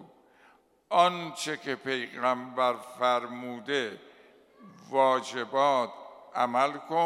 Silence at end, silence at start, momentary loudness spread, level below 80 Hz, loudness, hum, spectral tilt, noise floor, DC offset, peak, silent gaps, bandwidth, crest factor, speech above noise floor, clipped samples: 0 s; 0 s; 12 LU; -84 dBFS; -29 LUFS; none; -3.5 dB/octave; -62 dBFS; under 0.1%; -10 dBFS; none; 15 kHz; 20 dB; 33 dB; under 0.1%